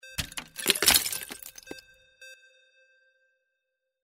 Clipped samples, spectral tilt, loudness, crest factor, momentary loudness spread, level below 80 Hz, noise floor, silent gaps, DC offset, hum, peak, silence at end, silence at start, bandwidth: under 0.1%; 0 dB/octave; -24 LUFS; 30 dB; 25 LU; -54 dBFS; -83 dBFS; none; under 0.1%; none; -2 dBFS; 1.7 s; 0.05 s; 16.5 kHz